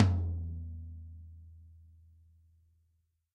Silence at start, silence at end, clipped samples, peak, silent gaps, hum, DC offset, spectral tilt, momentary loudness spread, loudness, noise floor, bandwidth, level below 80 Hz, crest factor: 0 s; 1.55 s; under 0.1%; -10 dBFS; none; none; under 0.1%; -8.5 dB/octave; 25 LU; -37 LUFS; -76 dBFS; 6.2 kHz; -48 dBFS; 26 dB